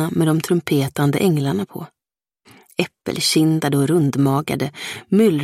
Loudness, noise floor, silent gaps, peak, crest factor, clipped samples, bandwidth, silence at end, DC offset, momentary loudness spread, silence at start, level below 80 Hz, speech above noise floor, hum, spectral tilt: -19 LUFS; -74 dBFS; none; -2 dBFS; 18 dB; under 0.1%; 16 kHz; 0 s; under 0.1%; 11 LU; 0 s; -58 dBFS; 56 dB; none; -5.5 dB/octave